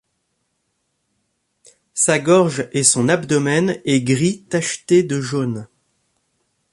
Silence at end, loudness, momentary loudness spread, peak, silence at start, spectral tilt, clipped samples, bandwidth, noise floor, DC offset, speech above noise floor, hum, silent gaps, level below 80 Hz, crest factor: 1.05 s; -17 LUFS; 8 LU; 0 dBFS; 1.95 s; -4.5 dB/octave; under 0.1%; 11.5 kHz; -71 dBFS; under 0.1%; 54 dB; none; none; -60 dBFS; 20 dB